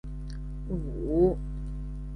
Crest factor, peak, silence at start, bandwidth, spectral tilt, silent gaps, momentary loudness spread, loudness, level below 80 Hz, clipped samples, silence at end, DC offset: 18 dB; -12 dBFS; 0.05 s; 10 kHz; -10.5 dB/octave; none; 14 LU; -31 LUFS; -36 dBFS; under 0.1%; 0 s; under 0.1%